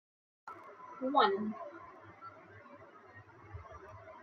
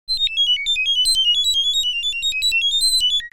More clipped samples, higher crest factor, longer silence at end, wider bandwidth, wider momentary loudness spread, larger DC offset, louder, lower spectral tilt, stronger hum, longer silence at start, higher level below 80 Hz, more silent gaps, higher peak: neither; first, 24 dB vs 10 dB; about the same, 0 s vs 0.05 s; second, 6.8 kHz vs 17 kHz; first, 26 LU vs 5 LU; neither; second, -33 LUFS vs -16 LUFS; first, -6.5 dB/octave vs 4.5 dB/octave; neither; first, 0.45 s vs 0.1 s; second, -72 dBFS vs -44 dBFS; neither; second, -16 dBFS vs -10 dBFS